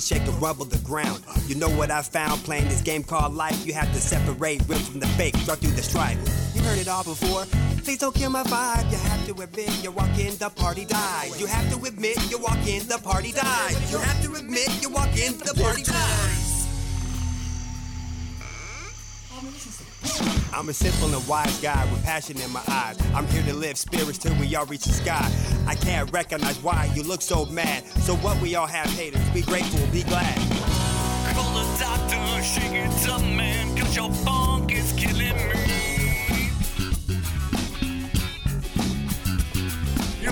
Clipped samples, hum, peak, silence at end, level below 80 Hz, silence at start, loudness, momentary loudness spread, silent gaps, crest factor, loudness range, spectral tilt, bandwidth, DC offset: under 0.1%; none; -10 dBFS; 0 s; -30 dBFS; 0 s; -25 LUFS; 6 LU; none; 14 dB; 3 LU; -4 dB/octave; over 20 kHz; under 0.1%